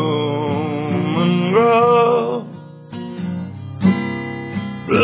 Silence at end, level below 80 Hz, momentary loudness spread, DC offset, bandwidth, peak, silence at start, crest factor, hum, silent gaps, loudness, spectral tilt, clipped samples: 0 s; -50 dBFS; 17 LU; under 0.1%; 4 kHz; -2 dBFS; 0 s; 16 dB; none; none; -18 LUFS; -11 dB/octave; under 0.1%